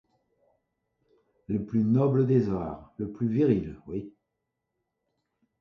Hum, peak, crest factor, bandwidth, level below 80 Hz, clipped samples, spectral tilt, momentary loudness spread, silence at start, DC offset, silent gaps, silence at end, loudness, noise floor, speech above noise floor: none; -10 dBFS; 18 dB; 6.2 kHz; -56 dBFS; under 0.1%; -11 dB/octave; 14 LU; 1.5 s; under 0.1%; none; 1.5 s; -27 LUFS; -83 dBFS; 57 dB